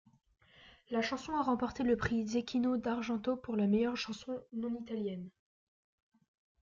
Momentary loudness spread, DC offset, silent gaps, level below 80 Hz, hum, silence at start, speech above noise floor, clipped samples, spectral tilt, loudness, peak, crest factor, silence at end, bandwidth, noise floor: 9 LU; under 0.1%; none; -62 dBFS; none; 0.6 s; 27 dB; under 0.1%; -6 dB/octave; -35 LUFS; -20 dBFS; 16 dB; 1.35 s; 7.4 kHz; -62 dBFS